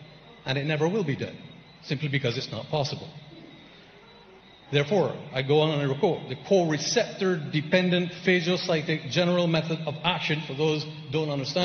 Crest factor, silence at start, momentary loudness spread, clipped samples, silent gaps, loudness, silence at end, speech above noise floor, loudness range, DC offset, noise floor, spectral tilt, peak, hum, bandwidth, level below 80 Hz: 20 dB; 0 s; 10 LU; under 0.1%; none; -26 LUFS; 0 s; 26 dB; 7 LU; under 0.1%; -51 dBFS; -5.5 dB/octave; -8 dBFS; none; 6.6 kHz; -64 dBFS